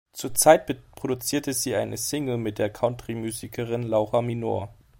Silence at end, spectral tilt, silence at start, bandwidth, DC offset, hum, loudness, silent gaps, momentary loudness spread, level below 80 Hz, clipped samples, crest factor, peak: 0.25 s; -4 dB/octave; 0.15 s; 16.5 kHz; under 0.1%; none; -25 LUFS; none; 13 LU; -56 dBFS; under 0.1%; 22 dB; -2 dBFS